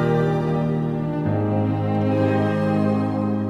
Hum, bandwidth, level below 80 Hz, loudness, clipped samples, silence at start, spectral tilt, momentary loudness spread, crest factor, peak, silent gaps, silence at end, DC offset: none; 8.4 kHz; -50 dBFS; -21 LUFS; under 0.1%; 0 s; -9.5 dB/octave; 3 LU; 12 dB; -8 dBFS; none; 0 s; under 0.1%